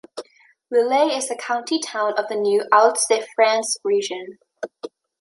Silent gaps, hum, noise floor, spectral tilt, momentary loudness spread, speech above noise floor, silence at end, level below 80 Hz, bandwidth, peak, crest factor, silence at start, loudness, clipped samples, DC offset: none; none; -46 dBFS; -1.5 dB/octave; 20 LU; 26 dB; 0.35 s; -80 dBFS; 11.5 kHz; -2 dBFS; 20 dB; 0.15 s; -20 LUFS; under 0.1%; under 0.1%